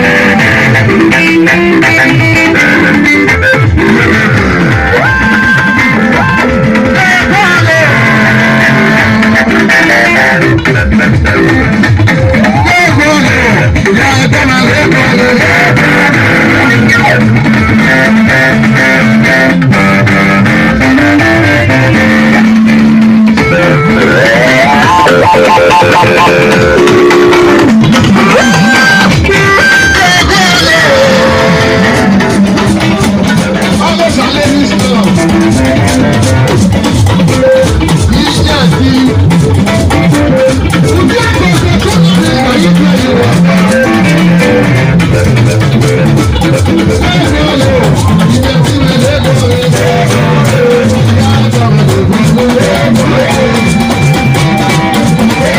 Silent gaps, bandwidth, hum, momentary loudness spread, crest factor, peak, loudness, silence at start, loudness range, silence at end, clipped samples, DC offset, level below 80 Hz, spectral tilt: none; 16.5 kHz; none; 3 LU; 6 dB; 0 dBFS; -6 LUFS; 0 s; 3 LU; 0 s; 0.2%; under 0.1%; -24 dBFS; -5.5 dB/octave